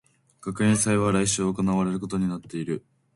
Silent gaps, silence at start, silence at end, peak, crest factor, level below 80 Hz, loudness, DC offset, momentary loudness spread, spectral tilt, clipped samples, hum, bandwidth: none; 0.45 s; 0.35 s; -10 dBFS; 16 dB; -52 dBFS; -25 LUFS; under 0.1%; 12 LU; -5 dB/octave; under 0.1%; none; 11.5 kHz